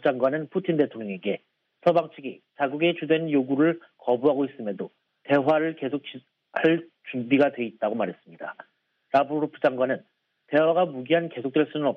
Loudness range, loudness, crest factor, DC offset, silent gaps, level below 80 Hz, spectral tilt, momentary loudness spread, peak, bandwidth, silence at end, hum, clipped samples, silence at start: 2 LU; -25 LUFS; 18 dB; under 0.1%; none; -76 dBFS; -8.5 dB/octave; 13 LU; -8 dBFS; 5.8 kHz; 0 s; none; under 0.1%; 0.05 s